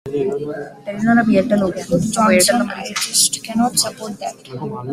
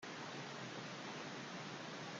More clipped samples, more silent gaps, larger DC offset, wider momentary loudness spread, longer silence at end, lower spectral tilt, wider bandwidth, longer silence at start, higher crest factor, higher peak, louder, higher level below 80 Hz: neither; neither; neither; first, 15 LU vs 0 LU; about the same, 0 s vs 0 s; about the same, -3.5 dB/octave vs -3.5 dB/octave; first, 15.5 kHz vs 10 kHz; about the same, 0.05 s vs 0 s; about the same, 16 dB vs 12 dB; first, 0 dBFS vs -36 dBFS; first, -16 LUFS vs -48 LUFS; first, -52 dBFS vs -88 dBFS